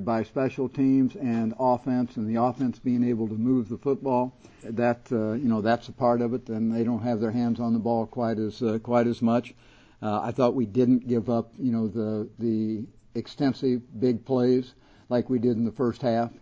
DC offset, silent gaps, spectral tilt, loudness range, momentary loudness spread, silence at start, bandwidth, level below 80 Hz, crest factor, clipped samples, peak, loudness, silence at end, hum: under 0.1%; none; -8.5 dB/octave; 1 LU; 6 LU; 0 s; 7.6 kHz; -58 dBFS; 18 dB; under 0.1%; -8 dBFS; -26 LUFS; 0.1 s; none